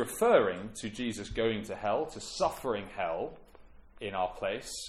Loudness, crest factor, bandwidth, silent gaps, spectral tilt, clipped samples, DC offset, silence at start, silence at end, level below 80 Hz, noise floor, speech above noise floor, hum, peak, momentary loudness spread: -32 LUFS; 20 dB; 15.5 kHz; none; -4 dB/octave; under 0.1%; under 0.1%; 0 s; 0 s; -54 dBFS; -54 dBFS; 22 dB; none; -12 dBFS; 13 LU